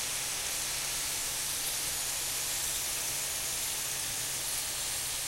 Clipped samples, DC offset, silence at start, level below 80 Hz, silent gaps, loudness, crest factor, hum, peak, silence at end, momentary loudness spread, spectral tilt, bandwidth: under 0.1%; under 0.1%; 0 s; -54 dBFS; none; -31 LUFS; 14 dB; none; -20 dBFS; 0 s; 1 LU; 0.5 dB/octave; 16 kHz